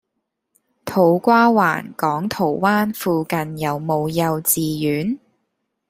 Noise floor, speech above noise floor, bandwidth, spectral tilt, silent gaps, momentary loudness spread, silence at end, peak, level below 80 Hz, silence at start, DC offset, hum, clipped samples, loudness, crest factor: -76 dBFS; 58 dB; 16 kHz; -5 dB/octave; none; 10 LU; 0.7 s; -2 dBFS; -58 dBFS; 0.85 s; under 0.1%; none; under 0.1%; -19 LUFS; 18 dB